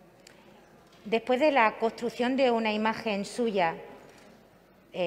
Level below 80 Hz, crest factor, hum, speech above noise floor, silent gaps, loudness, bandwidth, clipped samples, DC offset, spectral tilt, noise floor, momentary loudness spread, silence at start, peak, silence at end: -68 dBFS; 22 dB; none; 31 dB; none; -27 LUFS; 15.5 kHz; under 0.1%; under 0.1%; -5 dB/octave; -58 dBFS; 16 LU; 1.05 s; -8 dBFS; 0 s